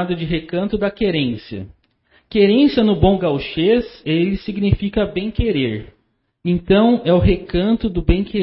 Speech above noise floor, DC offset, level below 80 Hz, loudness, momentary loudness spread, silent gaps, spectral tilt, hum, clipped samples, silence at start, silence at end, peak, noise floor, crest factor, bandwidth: 41 dB; under 0.1%; -30 dBFS; -17 LUFS; 9 LU; none; -12 dB/octave; none; under 0.1%; 0 s; 0 s; 0 dBFS; -58 dBFS; 16 dB; 5.8 kHz